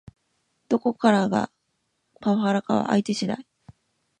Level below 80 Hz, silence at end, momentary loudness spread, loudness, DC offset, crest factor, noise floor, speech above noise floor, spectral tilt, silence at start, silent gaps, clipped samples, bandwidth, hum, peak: -64 dBFS; 0.8 s; 10 LU; -24 LUFS; under 0.1%; 20 dB; -74 dBFS; 52 dB; -6 dB/octave; 0.7 s; none; under 0.1%; 9.6 kHz; none; -6 dBFS